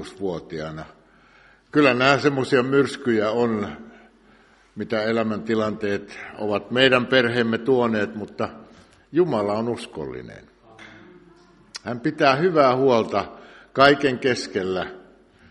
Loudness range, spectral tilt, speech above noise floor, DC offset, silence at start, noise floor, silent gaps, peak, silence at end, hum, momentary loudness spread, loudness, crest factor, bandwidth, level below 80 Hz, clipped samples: 7 LU; -5.5 dB/octave; 33 dB; under 0.1%; 0 s; -55 dBFS; none; 0 dBFS; 0.5 s; none; 16 LU; -21 LUFS; 22 dB; 11.5 kHz; -58 dBFS; under 0.1%